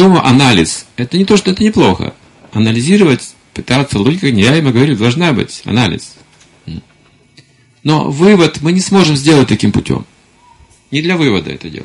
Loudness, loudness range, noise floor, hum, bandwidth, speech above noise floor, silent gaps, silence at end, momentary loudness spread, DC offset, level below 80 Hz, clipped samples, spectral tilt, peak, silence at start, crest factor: -11 LUFS; 3 LU; -48 dBFS; none; 11.5 kHz; 37 dB; none; 0 s; 13 LU; under 0.1%; -38 dBFS; 0.1%; -5.5 dB/octave; 0 dBFS; 0 s; 12 dB